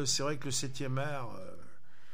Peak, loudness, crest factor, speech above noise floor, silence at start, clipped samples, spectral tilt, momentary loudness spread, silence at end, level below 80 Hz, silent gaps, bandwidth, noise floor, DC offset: -18 dBFS; -35 LUFS; 20 dB; 26 dB; 0 s; under 0.1%; -3.5 dB/octave; 18 LU; 0.45 s; -66 dBFS; none; 16 kHz; -61 dBFS; 2%